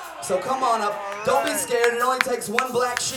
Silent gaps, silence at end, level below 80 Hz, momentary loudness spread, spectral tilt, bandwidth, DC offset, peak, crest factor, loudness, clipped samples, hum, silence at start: none; 0 s; -64 dBFS; 6 LU; -2 dB/octave; over 20 kHz; under 0.1%; 0 dBFS; 22 dB; -22 LUFS; under 0.1%; none; 0 s